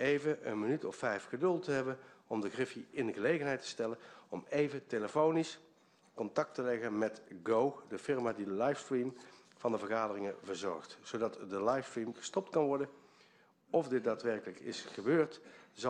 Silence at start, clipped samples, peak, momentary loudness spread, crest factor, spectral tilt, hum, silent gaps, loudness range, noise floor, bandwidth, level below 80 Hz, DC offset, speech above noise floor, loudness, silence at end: 0 s; under 0.1%; -18 dBFS; 11 LU; 20 dB; -5.5 dB/octave; none; none; 2 LU; -67 dBFS; 10 kHz; -80 dBFS; under 0.1%; 31 dB; -37 LUFS; 0 s